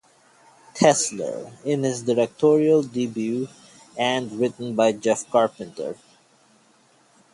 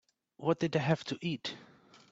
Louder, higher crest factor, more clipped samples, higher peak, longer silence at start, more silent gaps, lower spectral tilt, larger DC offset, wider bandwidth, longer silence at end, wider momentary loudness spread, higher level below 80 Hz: first, -22 LUFS vs -34 LUFS; about the same, 20 dB vs 20 dB; neither; first, -2 dBFS vs -14 dBFS; first, 0.75 s vs 0.4 s; neither; second, -4.5 dB/octave vs -6.5 dB/octave; neither; first, 11.5 kHz vs 7.8 kHz; first, 1.4 s vs 0.45 s; first, 15 LU vs 10 LU; about the same, -68 dBFS vs -72 dBFS